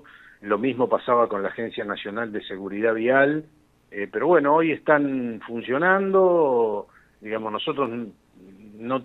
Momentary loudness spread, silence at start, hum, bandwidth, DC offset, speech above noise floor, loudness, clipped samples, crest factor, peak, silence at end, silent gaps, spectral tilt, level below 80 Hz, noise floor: 14 LU; 0.45 s; none; 4.1 kHz; under 0.1%; 26 dB; -23 LUFS; under 0.1%; 20 dB; -4 dBFS; 0 s; none; -8 dB/octave; -66 dBFS; -48 dBFS